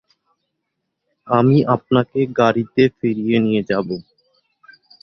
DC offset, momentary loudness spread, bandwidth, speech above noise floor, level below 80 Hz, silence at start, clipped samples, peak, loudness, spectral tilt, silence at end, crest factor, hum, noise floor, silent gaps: under 0.1%; 7 LU; 6.4 kHz; 59 dB; -56 dBFS; 1.25 s; under 0.1%; -2 dBFS; -17 LUFS; -8.5 dB/octave; 1 s; 18 dB; none; -76 dBFS; none